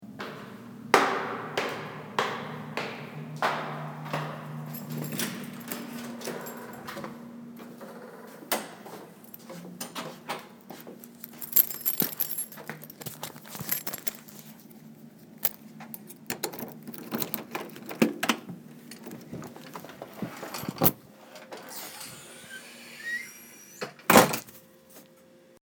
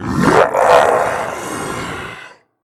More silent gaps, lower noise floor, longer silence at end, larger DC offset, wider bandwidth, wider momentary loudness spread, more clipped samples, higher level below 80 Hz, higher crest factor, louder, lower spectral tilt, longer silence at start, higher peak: neither; first, -56 dBFS vs -38 dBFS; second, 0.05 s vs 0.35 s; neither; first, over 20 kHz vs 16 kHz; first, 22 LU vs 17 LU; neither; second, -68 dBFS vs -42 dBFS; first, 32 dB vs 16 dB; second, -30 LUFS vs -14 LUFS; second, -3.5 dB/octave vs -5 dB/octave; about the same, 0 s vs 0 s; about the same, 0 dBFS vs 0 dBFS